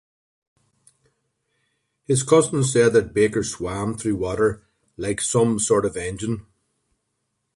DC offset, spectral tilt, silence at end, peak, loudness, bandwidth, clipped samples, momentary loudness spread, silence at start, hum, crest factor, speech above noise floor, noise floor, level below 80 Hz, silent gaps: under 0.1%; -5 dB/octave; 1.15 s; -4 dBFS; -21 LUFS; 11.5 kHz; under 0.1%; 11 LU; 2.1 s; none; 20 dB; 55 dB; -75 dBFS; -50 dBFS; none